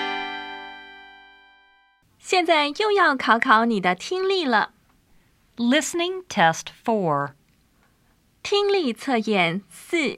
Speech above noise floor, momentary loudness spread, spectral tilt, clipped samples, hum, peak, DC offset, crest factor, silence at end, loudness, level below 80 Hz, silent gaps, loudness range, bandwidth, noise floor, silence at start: 41 dB; 15 LU; -4 dB/octave; under 0.1%; none; -2 dBFS; under 0.1%; 22 dB; 0 s; -22 LUFS; -66 dBFS; none; 4 LU; 15 kHz; -62 dBFS; 0 s